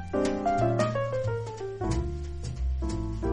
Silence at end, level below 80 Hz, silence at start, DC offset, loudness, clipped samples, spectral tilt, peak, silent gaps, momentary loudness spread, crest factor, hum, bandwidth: 0 s; -36 dBFS; 0 s; under 0.1%; -30 LUFS; under 0.1%; -7 dB/octave; -12 dBFS; none; 9 LU; 16 dB; none; 10.5 kHz